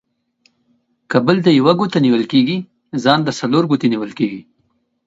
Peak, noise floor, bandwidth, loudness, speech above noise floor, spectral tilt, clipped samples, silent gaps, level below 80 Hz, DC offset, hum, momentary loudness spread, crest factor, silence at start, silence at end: 0 dBFS; -65 dBFS; 7.8 kHz; -16 LUFS; 50 dB; -6.5 dB/octave; under 0.1%; none; -60 dBFS; under 0.1%; none; 9 LU; 16 dB; 1.1 s; 0.65 s